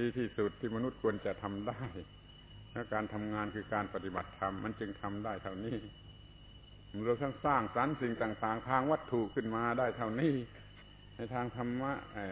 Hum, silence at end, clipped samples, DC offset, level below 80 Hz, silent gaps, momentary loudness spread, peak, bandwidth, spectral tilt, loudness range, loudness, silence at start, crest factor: 50 Hz at -60 dBFS; 0 s; under 0.1%; under 0.1%; -58 dBFS; none; 21 LU; -16 dBFS; 4 kHz; -5.5 dB/octave; 6 LU; -37 LUFS; 0 s; 22 dB